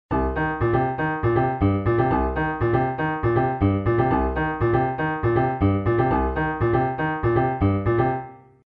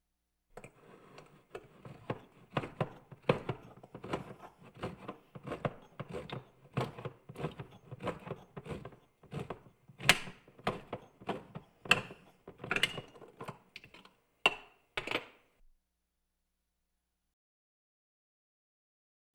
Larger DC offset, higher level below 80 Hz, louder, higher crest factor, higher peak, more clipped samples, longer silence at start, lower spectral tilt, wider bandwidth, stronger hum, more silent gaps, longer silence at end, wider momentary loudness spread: neither; first, -34 dBFS vs -64 dBFS; first, -22 LUFS vs -37 LUFS; second, 16 dB vs 36 dB; about the same, -6 dBFS vs -6 dBFS; neither; second, 0.1 s vs 0.55 s; first, -11 dB/octave vs -3.5 dB/octave; second, 4.7 kHz vs over 20 kHz; neither; neither; second, 0.4 s vs 4.05 s; second, 3 LU vs 24 LU